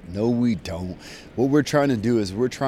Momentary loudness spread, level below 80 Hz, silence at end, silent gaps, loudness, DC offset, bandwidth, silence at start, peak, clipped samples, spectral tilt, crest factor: 14 LU; -48 dBFS; 0 s; none; -22 LUFS; under 0.1%; 13.5 kHz; 0.05 s; -8 dBFS; under 0.1%; -6.5 dB/octave; 16 dB